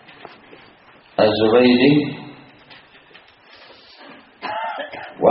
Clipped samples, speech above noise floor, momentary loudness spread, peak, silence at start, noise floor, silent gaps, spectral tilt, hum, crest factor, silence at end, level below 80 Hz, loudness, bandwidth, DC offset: under 0.1%; 35 dB; 20 LU; 0 dBFS; 1.2 s; -49 dBFS; none; -4 dB/octave; none; 20 dB; 0 s; -58 dBFS; -17 LUFS; 5.8 kHz; under 0.1%